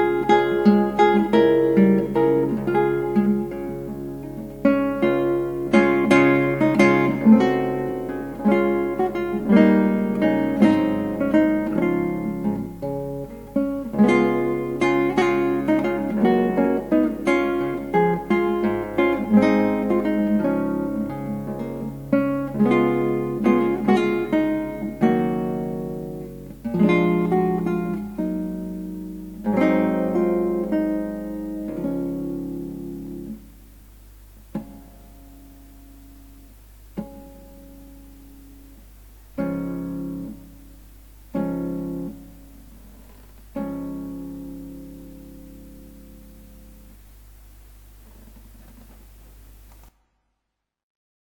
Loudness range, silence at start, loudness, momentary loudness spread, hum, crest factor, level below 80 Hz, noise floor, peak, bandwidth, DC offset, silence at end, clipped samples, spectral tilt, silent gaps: 19 LU; 0 s; -21 LUFS; 17 LU; none; 20 dB; -46 dBFS; -81 dBFS; -2 dBFS; 19.5 kHz; under 0.1%; 2.4 s; under 0.1%; -8 dB/octave; none